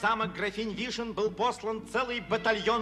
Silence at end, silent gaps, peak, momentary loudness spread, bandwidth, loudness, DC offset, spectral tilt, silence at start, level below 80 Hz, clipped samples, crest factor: 0 s; none; -12 dBFS; 6 LU; 12.5 kHz; -31 LUFS; under 0.1%; -4 dB/octave; 0 s; -56 dBFS; under 0.1%; 18 dB